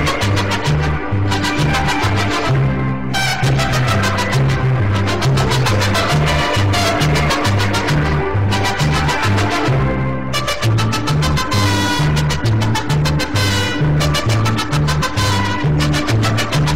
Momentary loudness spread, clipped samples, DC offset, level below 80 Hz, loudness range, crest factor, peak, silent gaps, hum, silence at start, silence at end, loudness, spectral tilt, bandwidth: 2 LU; under 0.1%; 4%; -28 dBFS; 1 LU; 10 dB; -6 dBFS; none; none; 0 s; 0 s; -16 LUFS; -5 dB/octave; 16 kHz